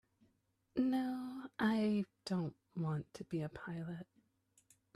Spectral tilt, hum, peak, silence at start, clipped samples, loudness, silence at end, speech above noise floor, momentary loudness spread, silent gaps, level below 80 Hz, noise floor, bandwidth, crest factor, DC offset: -7.5 dB/octave; none; -22 dBFS; 0.75 s; under 0.1%; -40 LUFS; 0.9 s; 41 dB; 11 LU; none; -74 dBFS; -79 dBFS; 13.5 kHz; 18 dB; under 0.1%